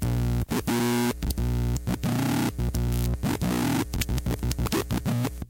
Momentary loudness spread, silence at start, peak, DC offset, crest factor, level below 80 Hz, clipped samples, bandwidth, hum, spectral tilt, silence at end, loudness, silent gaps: 3 LU; 0 s; -14 dBFS; under 0.1%; 12 dB; -32 dBFS; under 0.1%; 17 kHz; none; -5.5 dB/octave; 0.05 s; -27 LUFS; none